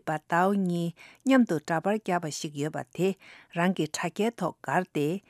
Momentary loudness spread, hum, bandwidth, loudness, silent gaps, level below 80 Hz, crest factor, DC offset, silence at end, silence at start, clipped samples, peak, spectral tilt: 10 LU; none; 15.5 kHz; -28 LUFS; none; -76 dBFS; 18 dB; under 0.1%; 0.1 s; 0.05 s; under 0.1%; -10 dBFS; -5.5 dB/octave